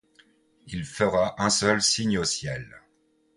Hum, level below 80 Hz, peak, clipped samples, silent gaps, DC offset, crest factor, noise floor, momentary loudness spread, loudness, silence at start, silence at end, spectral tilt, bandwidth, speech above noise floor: none; -52 dBFS; -8 dBFS; under 0.1%; none; under 0.1%; 20 dB; -67 dBFS; 15 LU; -24 LUFS; 0.65 s; 0.6 s; -3 dB/octave; 11.5 kHz; 41 dB